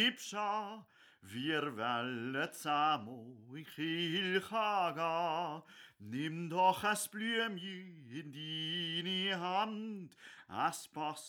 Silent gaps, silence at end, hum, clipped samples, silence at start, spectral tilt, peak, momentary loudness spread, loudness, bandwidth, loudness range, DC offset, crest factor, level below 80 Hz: none; 0 s; none; under 0.1%; 0 s; -3.5 dB/octave; -16 dBFS; 16 LU; -36 LUFS; over 20 kHz; 3 LU; under 0.1%; 20 dB; -86 dBFS